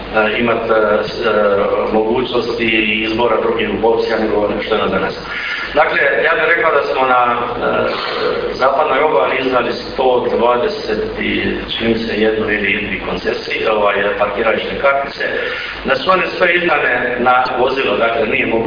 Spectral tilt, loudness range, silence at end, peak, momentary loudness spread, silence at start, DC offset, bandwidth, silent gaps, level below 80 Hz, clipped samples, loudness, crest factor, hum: -6 dB/octave; 2 LU; 0 s; 0 dBFS; 6 LU; 0 s; under 0.1%; 5.2 kHz; none; -40 dBFS; under 0.1%; -15 LUFS; 14 dB; none